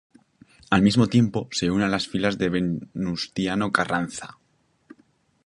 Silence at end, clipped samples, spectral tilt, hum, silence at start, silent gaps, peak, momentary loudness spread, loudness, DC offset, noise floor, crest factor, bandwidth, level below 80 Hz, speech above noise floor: 1.2 s; under 0.1%; -5.5 dB/octave; none; 0.7 s; none; -2 dBFS; 10 LU; -23 LUFS; under 0.1%; -67 dBFS; 22 dB; 11 kHz; -52 dBFS; 44 dB